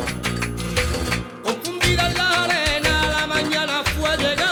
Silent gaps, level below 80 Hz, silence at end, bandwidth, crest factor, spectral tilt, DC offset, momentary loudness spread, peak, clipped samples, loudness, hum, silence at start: none; -34 dBFS; 0 s; over 20 kHz; 16 dB; -3.5 dB/octave; under 0.1%; 7 LU; -4 dBFS; under 0.1%; -20 LUFS; none; 0 s